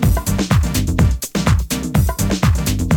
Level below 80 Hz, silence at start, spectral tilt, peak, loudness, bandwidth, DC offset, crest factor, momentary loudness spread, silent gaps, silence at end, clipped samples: -22 dBFS; 0 s; -5.5 dB/octave; -2 dBFS; -17 LUFS; 20 kHz; under 0.1%; 14 dB; 2 LU; none; 0 s; under 0.1%